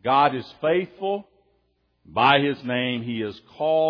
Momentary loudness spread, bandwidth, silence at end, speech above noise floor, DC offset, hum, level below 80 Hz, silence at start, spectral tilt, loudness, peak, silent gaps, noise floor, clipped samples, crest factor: 12 LU; 5.4 kHz; 0 s; 46 dB; under 0.1%; none; -66 dBFS; 0.05 s; -7.5 dB/octave; -23 LUFS; -4 dBFS; none; -68 dBFS; under 0.1%; 20 dB